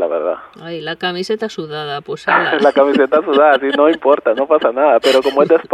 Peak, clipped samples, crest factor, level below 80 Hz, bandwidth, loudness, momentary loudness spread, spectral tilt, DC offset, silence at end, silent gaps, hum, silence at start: 0 dBFS; under 0.1%; 14 dB; -62 dBFS; 13.5 kHz; -14 LUFS; 12 LU; -5 dB/octave; under 0.1%; 0 s; none; none; 0 s